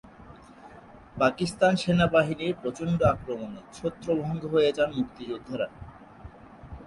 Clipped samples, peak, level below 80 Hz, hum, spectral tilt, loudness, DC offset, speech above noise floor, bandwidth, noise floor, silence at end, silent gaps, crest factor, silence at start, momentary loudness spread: under 0.1%; -8 dBFS; -50 dBFS; none; -6.5 dB/octave; -27 LUFS; under 0.1%; 23 dB; 11.5 kHz; -49 dBFS; 0 s; none; 20 dB; 0.05 s; 24 LU